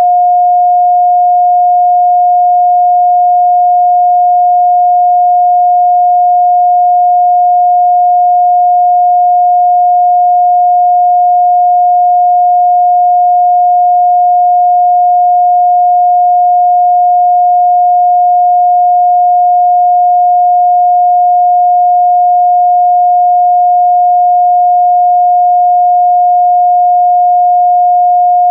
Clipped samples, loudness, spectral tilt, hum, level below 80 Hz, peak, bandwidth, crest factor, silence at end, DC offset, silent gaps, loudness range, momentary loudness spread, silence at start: under 0.1%; -7 LUFS; -8.5 dB/octave; none; under -90 dBFS; -4 dBFS; 0.8 kHz; 4 dB; 0 s; under 0.1%; none; 0 LU; 0 LU; 0 s